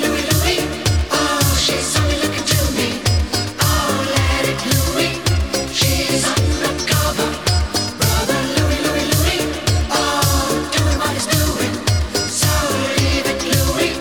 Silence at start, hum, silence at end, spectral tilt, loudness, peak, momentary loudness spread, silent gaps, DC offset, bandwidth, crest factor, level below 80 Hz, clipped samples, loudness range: 0 s; none; 0 s; -3.5 dB/octave; -17 LUFS; -2 dBFS; 3 LU; none; 0.4%; over 20 kHz; 14 dB; -26 dBFS; under 0.1%; 1 LU